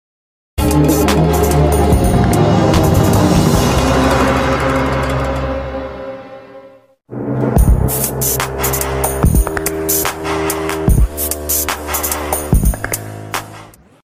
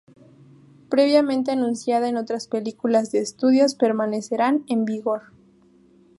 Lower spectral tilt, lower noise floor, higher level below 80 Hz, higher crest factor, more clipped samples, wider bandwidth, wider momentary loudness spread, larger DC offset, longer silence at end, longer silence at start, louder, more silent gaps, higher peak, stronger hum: about the same, -5 dB/octave vs -5 dB/octave; second, -43 dBFS vs -55 dBFS; first, -20 dBFS vs -72 dBFS; about the same, 14 dB vs 18 dB; neither; first, 16 kHz vs 11.5 kHz; first, 12 LU vs 9 LU; neither; second, 0.35 s vs 1 s; second, 0.55 s vs 0.9 s; first, -14 LUFS vs -22 LUFS; neither; first, 0 dBFS vs -4 dBFS; neither